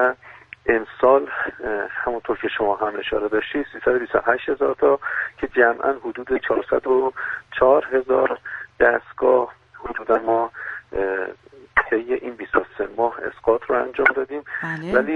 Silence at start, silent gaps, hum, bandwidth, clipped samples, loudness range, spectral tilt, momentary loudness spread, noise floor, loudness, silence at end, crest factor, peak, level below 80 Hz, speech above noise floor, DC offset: 0 s; none; none; 4.9 kHz; under 0.1%; 3 LU; -7 dB/octave; 10 LU; -44 dBFS; -21 LUFS; 0 s; 20 dB; 0 dBFS; -50 dBFS; 23 dB; under 0.1%